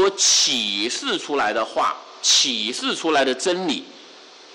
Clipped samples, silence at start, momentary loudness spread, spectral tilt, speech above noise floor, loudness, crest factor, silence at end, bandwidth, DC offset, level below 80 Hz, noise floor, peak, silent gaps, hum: under 0.1%; 0 s; 9 LU; -0.5 dB/octave; 24 dB; -19 LUFS; 12 dB; 0 s; 16.5 kHz; under 0.1%; -66 dBFS; -45 dBFS; -8 dBFS; none; none